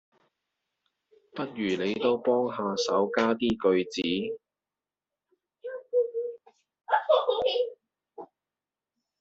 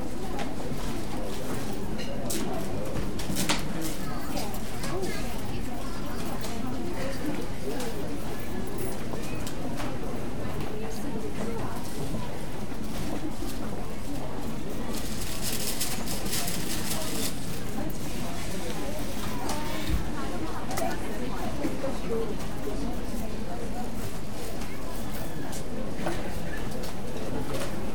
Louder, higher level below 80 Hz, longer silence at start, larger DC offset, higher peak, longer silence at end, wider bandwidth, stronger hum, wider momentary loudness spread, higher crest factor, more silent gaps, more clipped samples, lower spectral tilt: first, -28 LUFS vs -33 LUFS; second, -66 dBFS vs -40 dBFS; first, 1.35 s vs 0 s; second, under 0.1% vs 5%; about the same, -10 dBFS vs -10 dBFS; first, 0.95 s vs 0 s; second, 8 kHz vs 19.5 kHz; neither; first, 17 LU vs 6 LU; about the same, 20 dB vs 22 dB; neither; neither; second, -3 dB/octave vs -4.5 dB/octave